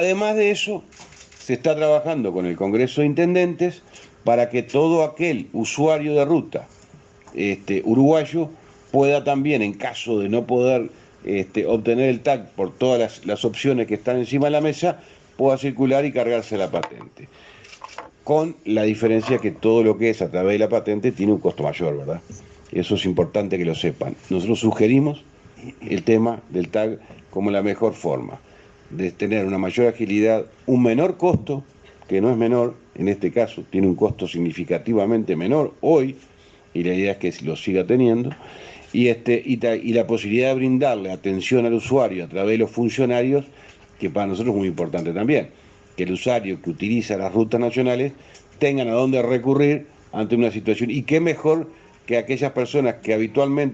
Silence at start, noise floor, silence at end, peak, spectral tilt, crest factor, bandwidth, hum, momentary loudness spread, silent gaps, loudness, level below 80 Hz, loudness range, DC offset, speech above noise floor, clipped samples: 0 s; -49 dBFS; 0 s; -4 dBFS; -6.5 dB/octave; 16 dB; 8.2 kHz; none; 10 LU; none; -21 LUFS; -58 dBFS; 3 LU; under 0.1%; 29 dB; under 0.1%